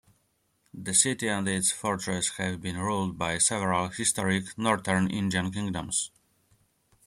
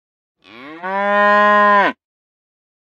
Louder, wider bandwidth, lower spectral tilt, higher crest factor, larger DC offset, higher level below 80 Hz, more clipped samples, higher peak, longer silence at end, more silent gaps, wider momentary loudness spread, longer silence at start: second, -27 LUFS vs -13 LUFS; first, 15.5 kHz vs 7.4 kHz; second, -3 dB/octave vs -5.5 dB/octave; first, 22 dB vs 16 dB; neither; first, -60 dBFS vs -78 dBFS; neither; second, -6 dBFS vs 0 dBFS; about the same, 1 s vs 0.9 s; neither; second, 8 LU vs 12 LU; first, 0.75 s vs 0.6 s